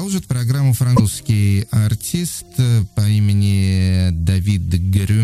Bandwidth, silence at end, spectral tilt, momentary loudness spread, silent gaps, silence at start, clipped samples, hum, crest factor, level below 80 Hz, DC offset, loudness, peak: 15 kHz; 0 s; -6 dB/octave; 5 LU; none; 0 s; under 0.1%; none; 14 dB; -34 dBFS; under 0.1%; -17 LUFS; -2 dBFS